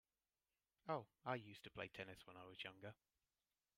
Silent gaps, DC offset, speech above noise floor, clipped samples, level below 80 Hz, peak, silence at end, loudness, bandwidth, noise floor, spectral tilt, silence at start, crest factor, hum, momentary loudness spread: none; under 0.1%; over 37 dB; under 0.1%; -84 dBFS; -32 dBFS; 0.85 s; -53 LUFS; 15.5 kHz; under -90 dBFS; -5.5 dB/octave; 0.85 s; 24 dB; none; 11 LU